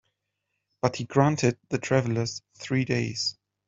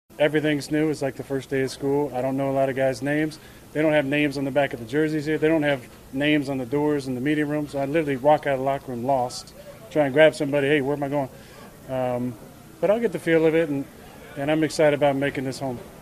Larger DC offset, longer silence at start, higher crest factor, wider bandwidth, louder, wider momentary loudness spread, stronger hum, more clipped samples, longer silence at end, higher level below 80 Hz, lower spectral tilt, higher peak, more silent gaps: neither; first, 0.85 s vs 0.2 s; about the same, 22 dB vs 20 dB; second, 8 kHz vs 15 kHz; second, -27 LUFS vs -23 LUFS; second, 8 LU vs 12 LU; neither; neither; first, 0.35 s vs 0 s; second, -62 dBFS vs -54 dBFS; about the same, -5.5 dB/octave vs -6 dB/octave; about the same, -4 dBFS vs -4 dBFS; neither